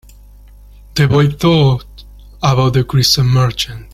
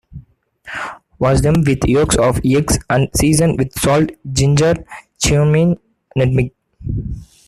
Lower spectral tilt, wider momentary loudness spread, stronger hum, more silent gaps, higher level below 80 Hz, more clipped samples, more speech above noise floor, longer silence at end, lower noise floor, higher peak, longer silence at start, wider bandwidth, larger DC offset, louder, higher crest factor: about the same, -5.5 dB/octave vs -5.5 dB/octave; second, 8 LU vs 13 LU; first, 50 Hz at -35 dBFS vs none; neither; about the same, -34 dBFS vs -30 dBFS; neither; about the same, 27 dB vs 30 dB; second, 0.1 s vs 0.25 s; second, -39 dBFS vs -44 dBFS; about the same, 0 dBFS vs 0 dBFS; first, 0.95 s vs 0.1 s; first, 15.5 kHz vs 14 kHz; neither; about the same, -13 LUFS vs -15 LUFS; about the same, 14 dB vs 16 dB